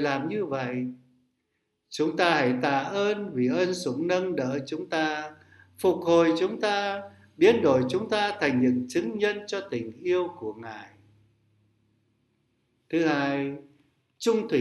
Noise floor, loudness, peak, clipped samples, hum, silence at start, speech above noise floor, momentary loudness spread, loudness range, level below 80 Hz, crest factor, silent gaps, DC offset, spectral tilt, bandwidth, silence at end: -78 dBFS; -26 LUFS; -6 dBFS; under 0.1%; none; 0 s; 52 dB; 13 LU; 8 LU; -72 dBFS; 22 dB; none; under 0.1%; -5.5 dB/octave; 12 kHz; 0 s